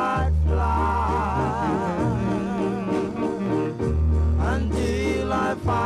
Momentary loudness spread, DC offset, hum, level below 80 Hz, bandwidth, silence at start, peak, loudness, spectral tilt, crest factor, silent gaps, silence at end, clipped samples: 3 LU; under 0.1%; none; -28 dBFS; 10.5 kHz; 0 s; -10 dBFS; -24 LUFS; -7.5 dB/octave; 12 dB; none; 0 s; under 0.1%